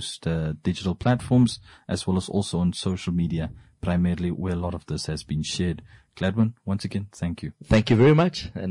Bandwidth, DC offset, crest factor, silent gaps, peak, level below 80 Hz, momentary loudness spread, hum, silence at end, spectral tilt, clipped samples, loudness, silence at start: 11.5 kHz; under 0.1%; 16 dB; none; -8 dBFS; -44 dBFS; 11 LU; none; 0 s; -6.5 dB/octave; under 0.1%; -25 LUFS; 0 s